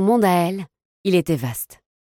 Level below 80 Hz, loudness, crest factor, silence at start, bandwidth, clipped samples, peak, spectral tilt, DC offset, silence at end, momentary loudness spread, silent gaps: -56 dBFS; -21 LUFS; 16 dB; 0 s; 17.5 kHz; under 0.1%; -4 dBFS; -6 dB/octave; under 0.1%; 0.5 s; 16 LU; 0.85-1.04 s